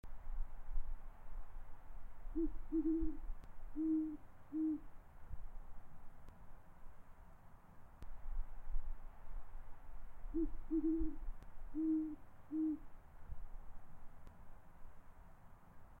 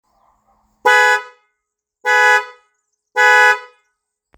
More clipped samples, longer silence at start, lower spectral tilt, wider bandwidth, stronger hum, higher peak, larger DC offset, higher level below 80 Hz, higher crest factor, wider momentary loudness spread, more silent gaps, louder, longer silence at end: neither; second, 0.05 s vs 0.85 s; first, -9.5 dB/octave vs 2.5 dB/octave; second, 2.5 kHz vs over 20 kHz; neither; second, -26 dBFS vs 0 dBFS; neither; first, -48 dBFS vs -72 dBFS; about the same, 16 dB vs 16 dB; first, 25 LU vs 14 LU; neither; second, -44 LUFS vs -13 LUFS; second, 0 s vs 0.75 s